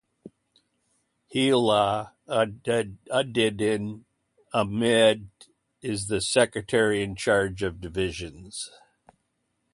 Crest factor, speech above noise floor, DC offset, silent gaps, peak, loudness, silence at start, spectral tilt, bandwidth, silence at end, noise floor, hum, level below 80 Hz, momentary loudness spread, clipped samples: 20 dB; 51 dB; under 0.1%; none; -6 dBFS; -25 LUFS; 0.25 s; -4 dB/octave; 11.5 kHz; 1.05 s; -76 dBFS; none; -54 dBFS; 15 LU; under 0.1%